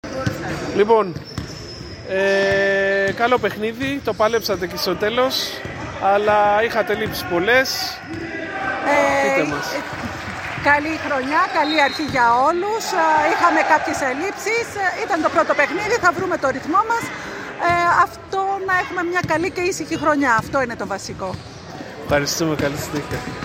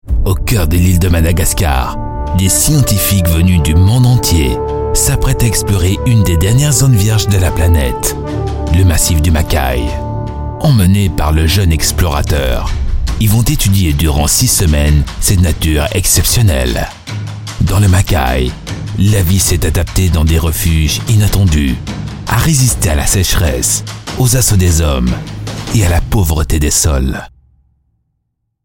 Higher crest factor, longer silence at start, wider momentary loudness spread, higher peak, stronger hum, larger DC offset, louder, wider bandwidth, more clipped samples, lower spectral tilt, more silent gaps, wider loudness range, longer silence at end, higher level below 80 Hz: first, 18 dB vs 10 dB; about the same, 0.05 s vs 0.05 s; first, 12 LU vs 9 LU; about the same, -2 dBFS vs 0 dBFS; neither; neither; second, -19 LUFS vs -12 LUFS; about the same, 16.5 kHz vs 17 kHz; neither; about the same, -4 dB/octave vs -4.5 dB/octave; neither; about the same, 3 LU vs 2 LU; second, 0 s vs 1.35 s; second, -46 dBFS vs -18 dBFS